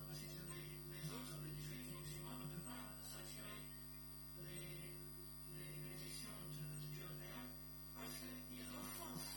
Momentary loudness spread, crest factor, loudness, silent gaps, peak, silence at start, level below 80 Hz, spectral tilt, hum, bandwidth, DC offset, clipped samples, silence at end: 3 LU; 14 dB; -51 LUFS; none; -38 dBFS; 0 s; -64 dBFS; -4 dB/octave; 50 Hz at -60 dBFS; 17.5 kHz; under 0.1%; under 0.1%; 0 s